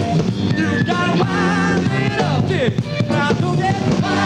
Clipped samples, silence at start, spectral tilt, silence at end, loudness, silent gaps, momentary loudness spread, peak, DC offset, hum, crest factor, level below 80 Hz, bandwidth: under 0.1%; 0 s; -6.5 dB/octave; 0 s; -17 LUFS; none; 2 LU; -6 dBFS; under 0.1%; none; 12 dB; -44 dBFS; 10 kHz